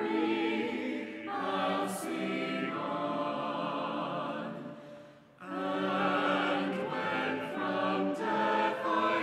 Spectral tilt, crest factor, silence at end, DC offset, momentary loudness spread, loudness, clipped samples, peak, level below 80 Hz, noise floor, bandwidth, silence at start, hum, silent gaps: -5 dB/octave; 16 dB; 0 s; under 0.1%; 9 LU; -33 LUFS; under 0.1%; -18 dBFS; -78 dBFS; -52 dBFS; 15 kHz; 0 s; none; none